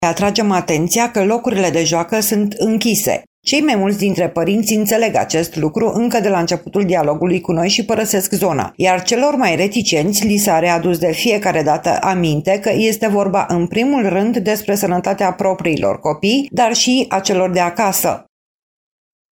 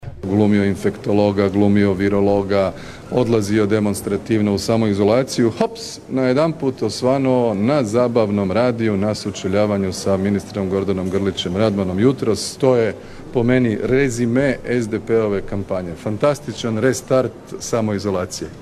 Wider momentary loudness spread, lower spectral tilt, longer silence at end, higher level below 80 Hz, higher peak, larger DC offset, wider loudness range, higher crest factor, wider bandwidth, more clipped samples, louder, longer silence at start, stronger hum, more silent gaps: second, 3 LU vs 7 LU; second, -4 dB/octave vs -6 dB/octave; first, 1.15 s vs 0 s; second, -50 dBFS vs -44 dBFS; about the same, -2 dBFS vs -2 dBFS; neither; about the same, 1 LU vs 2 LU; about the same, 14 dB vs 16 dB; first, 17.5 kHz vs 13.5 kHz; neither; first, -15 LUFS vs -18 LUFS; about the same, 0 s vs 0 s; neither; first, 3.27-3.43 s vs none